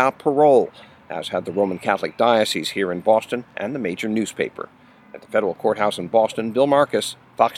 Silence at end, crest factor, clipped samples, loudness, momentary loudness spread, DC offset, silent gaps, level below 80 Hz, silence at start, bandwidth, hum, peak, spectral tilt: 0 s; 20 dB; under 0.1%; -21 LUFS; 11 LU; under 0.1%; none; -66 dBFS; 0 s; 16 kHz; none; 0 dBFS; -4.5 dB/octave